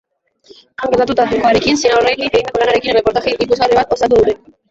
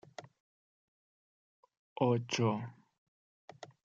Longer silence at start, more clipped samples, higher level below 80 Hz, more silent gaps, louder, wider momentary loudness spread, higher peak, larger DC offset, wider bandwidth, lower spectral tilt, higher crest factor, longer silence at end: first, 0.8 s vs 0.2 s; neither; first, -40 dBFS vs -82 dBFS; second, none vs 0.40-1.63 s, 1.77-1.96 s, 2.98-3.48 s; first, -13 LUFS vs -34 LUFS; second, 5 LU vs 22 LU; first, -2 dBFS vs -16 dBFS; neither; about the same, 8 kHz vs 7.4 kHz; second, -4 dB/octave vs -6 dB/octave; second, 12 dB vs 22 dB; about the same, 0.35 s vs 0.3 s